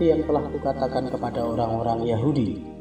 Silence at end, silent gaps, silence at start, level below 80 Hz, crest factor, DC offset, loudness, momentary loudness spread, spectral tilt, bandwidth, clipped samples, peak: 0 s; none; 0 s; -46 dBFS; 16 dB; 0.1%; -25 LUFS; 4 LU; -8.5 dB/octave; 8.8 kHz; under 0.1%; -8 dBFS